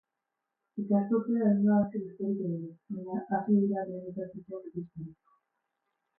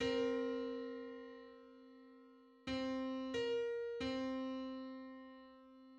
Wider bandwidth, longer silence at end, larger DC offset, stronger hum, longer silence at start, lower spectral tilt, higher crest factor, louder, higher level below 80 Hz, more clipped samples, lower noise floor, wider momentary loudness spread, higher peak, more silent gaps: second, 2.1 kHz vs 8.6 kHz; first, 1.05 s vs 0 s; neither; neither; first, 0.75 s vs 0 s; first, -14.5 dB/octave vs -5 dB/octave; about the same, 16 dB vs 16 dB; first, -31 LUFS vs -43 LUFS; about the same, -74 dBFS vs -70 dBFS; neither; first, -86 dBFS vs -64 dBFS; second, 16 LU vs 21 LU; first, -16 dBFS vs -28 dBFS; neither